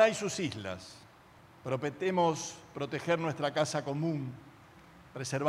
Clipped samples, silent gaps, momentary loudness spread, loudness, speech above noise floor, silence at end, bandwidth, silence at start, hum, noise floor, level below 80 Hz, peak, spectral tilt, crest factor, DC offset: under 0.1%; none; 16 LU; -33 LUFS; 24 dB; 0 s; 15.5 kHz; 0 s; none; -58 dBFS; -72 dBFS; -10 dBFS; -5 dB/octave; 22 dB; under 0.1%